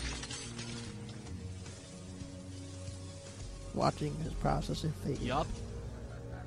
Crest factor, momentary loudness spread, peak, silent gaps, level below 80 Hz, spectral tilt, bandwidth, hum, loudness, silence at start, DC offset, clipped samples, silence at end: 24 dB; 13 LU; -16 dBFS; none; -48 dBFS; -5.5 dB/octave; 13.5 kHz; none; -39 LUFS; 0 s; under 0.1%; under 0.1%; 0 s